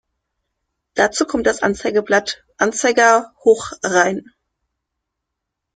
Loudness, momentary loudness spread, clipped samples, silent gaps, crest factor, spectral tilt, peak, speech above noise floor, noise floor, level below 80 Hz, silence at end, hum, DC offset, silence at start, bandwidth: -17 LUFS; 7 LU; under 0.1%; none; 18 dB; -3 dB/octave; -2 dBFS; 63 dB; -80 dBFS; -54 dBFS; 1.55 s; none; under 0.1%; 0.95 s; 9.4 kHz